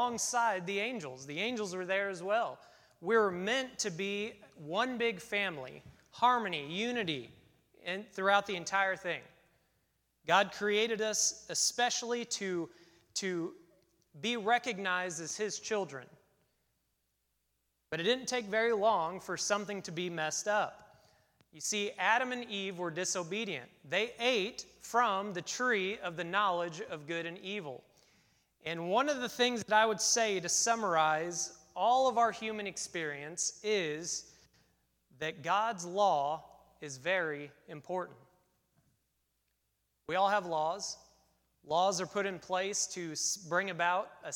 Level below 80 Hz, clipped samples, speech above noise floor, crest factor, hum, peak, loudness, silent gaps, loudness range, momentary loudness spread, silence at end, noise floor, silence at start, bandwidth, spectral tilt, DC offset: -76 dBFS; under 0.1%; 47 dB; 22 dB; none; -12 dBFS; -33 LUFS; none; 6 LU; 11 LU; 0 s; -81 dBFS; 0 s; 18.5 kHz; -2 dB/octave; under 0.1%